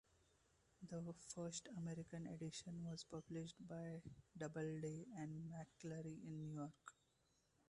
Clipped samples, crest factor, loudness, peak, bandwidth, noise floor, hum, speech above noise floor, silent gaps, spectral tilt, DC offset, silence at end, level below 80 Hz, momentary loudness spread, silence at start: under 0.1%; 16 dB; -52 LUFS; -36 dBFS; 11 kHz; -82 dBFS; none; 30 dB; none; -5.5 dB/octave; under 0.1%; 0.8 s; -80 dBFS; 6 LU; 0.8 s